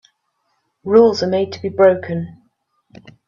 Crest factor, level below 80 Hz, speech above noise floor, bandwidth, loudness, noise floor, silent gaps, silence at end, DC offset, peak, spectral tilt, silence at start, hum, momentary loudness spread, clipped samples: 18 dB; -60 dBFS; 54 dB; 7.2 kHz; -16 LUFS; -68 dBFS; none; 1 s; under 0.1%; 0 dBFS; -6.5 dB/octave; 0.85 s; none; 16 LU; under 0.1%